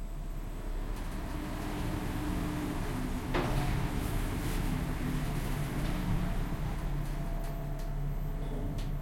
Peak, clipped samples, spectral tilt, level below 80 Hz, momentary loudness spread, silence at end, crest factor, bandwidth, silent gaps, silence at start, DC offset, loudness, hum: -18 dBFS; under 0.1%; -6 dB/octave; -36 dBFS; 6 LU; 0 s; 14 dB; 16.5 kHz; none; 0 s; under 0.1%; -36 LUFS; none